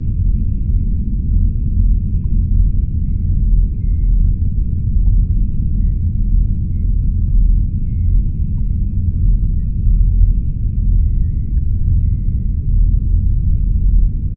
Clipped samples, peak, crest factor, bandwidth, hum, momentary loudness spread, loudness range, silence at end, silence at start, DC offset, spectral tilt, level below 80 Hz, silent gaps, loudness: under 0.1%; 0 dBFS; 12 dB; 0.6 kHz; none; 3 LU; 1 LU; 0 s; 0 s; under 0.1%; -15 dB/octave; -14 dBFS; none; -18 LUFS